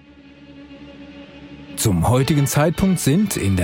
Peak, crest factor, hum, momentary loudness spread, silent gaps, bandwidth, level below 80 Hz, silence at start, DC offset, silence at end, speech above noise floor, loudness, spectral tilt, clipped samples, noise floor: -4 dBFS; 16 dB; none; 23 LU; none; 17 kHz; -40 dBFS; 0.5 s; under 0.1%; 0 s; 28 dB; -18 LUFS; -5.5 dB/octave; under 0.1%; -44 dBFS